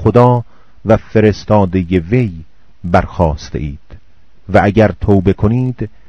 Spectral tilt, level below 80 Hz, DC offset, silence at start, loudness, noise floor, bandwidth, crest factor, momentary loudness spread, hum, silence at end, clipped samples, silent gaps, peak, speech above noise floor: -8.5 dB/octave; -30 dBFS; 2%; 0 s; -13 LUFS; -48 dBFS; 7 kHz; 14 dB; 13 LU; none; 0.2 s; 0.7%; none; 0 dBFS; 37 dB